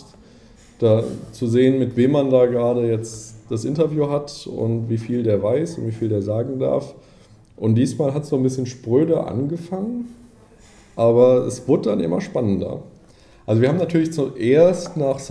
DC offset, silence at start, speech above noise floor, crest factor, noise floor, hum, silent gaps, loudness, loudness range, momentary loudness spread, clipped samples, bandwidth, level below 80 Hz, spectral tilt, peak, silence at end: under 0.1%; 0 s; 30 dB; 16 dB; -49 dBFS; none; none; -20 LUFS; 3 LU; 11 LU; under 0.1%; 11 kHz; -54 dBFS; -7.5 dB/octave; -2 dBFS; 0 s